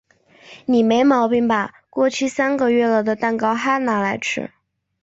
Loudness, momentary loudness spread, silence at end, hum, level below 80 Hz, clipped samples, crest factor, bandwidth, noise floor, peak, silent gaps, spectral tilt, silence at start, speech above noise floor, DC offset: -19 LUFS; 9 LU; 0.55 s; none; -62 dBFS; under 0.1%; 14 dB; 8 kHz; -48 dBFS; -4 dBFS; none; -5 dB/octave; 0.5 s; 30 dB; under 0.1%